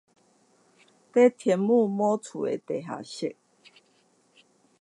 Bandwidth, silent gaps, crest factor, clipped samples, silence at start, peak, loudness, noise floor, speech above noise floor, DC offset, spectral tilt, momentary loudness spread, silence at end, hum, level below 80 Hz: 11 kHz; none; 20 dB; under 0.1%; 1.15 s; -8 dBFS; -26 LUFS; -65 dBFS; 41 dB; under 0.1%; -6.5 dB/octave; 13 LU; 1.5 s; none; -82 dBFS